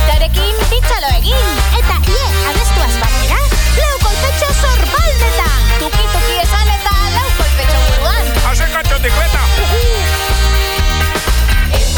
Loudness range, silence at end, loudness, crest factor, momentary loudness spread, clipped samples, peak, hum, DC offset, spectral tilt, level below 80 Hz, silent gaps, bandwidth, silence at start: 0 LU; 0 s; -13 LUFS; 10 dB; 1 LU; under 0.1%; 0 dBFS; none; under 0.1%; -3.5 dB/octave; -12 dBFS; none; 19.5 kHz; 0 s